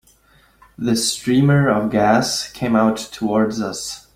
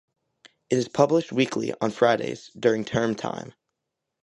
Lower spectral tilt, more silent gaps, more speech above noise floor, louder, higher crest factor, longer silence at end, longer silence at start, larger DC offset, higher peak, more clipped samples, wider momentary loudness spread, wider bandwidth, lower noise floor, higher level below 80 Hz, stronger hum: about the same, -5 dB/octave vs -5.5 dB/octave; neither; second, 37 dB vs 59 dB; first, -18 LUFS vs -24 LUFS; second, 16 dB vs 22 dB; second, 0.15 s vs 0.75 s; about the same, 0.8 s vs 0.7 s; neither; about the same, -2 dBFS vs -4 dBFS; neither; second, 9 LU vs 12 LU; first, 16 kHz vs 11.5 kHz; second, -54 dBFS vs -83 dBFS; first, -50 dBFS vs -62 dBFS; neither